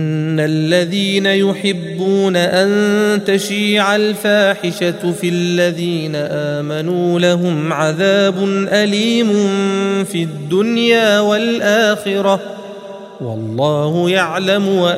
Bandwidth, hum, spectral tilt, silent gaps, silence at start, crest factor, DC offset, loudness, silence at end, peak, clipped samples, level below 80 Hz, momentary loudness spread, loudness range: 15.5 kHz; none; -5 dB/octave; none; 0 s; 14 dB; under 0.1%; -15 LUFS; 0 s; 0 dBFS; under 0.1%; -62 dBFS; 7 LU; 2 LU